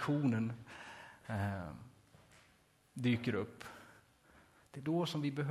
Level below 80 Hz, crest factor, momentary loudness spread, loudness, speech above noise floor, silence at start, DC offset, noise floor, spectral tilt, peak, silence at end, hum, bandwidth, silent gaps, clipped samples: -64 dBFS; 18 dB; 19 LU; -38 LUFS; 33 dB; 0 s; under 0.1%; -70 dBFS; -7 dB/octave; -22 dBFS; 0 s; none; 14.5 kHz; none; under 0.1%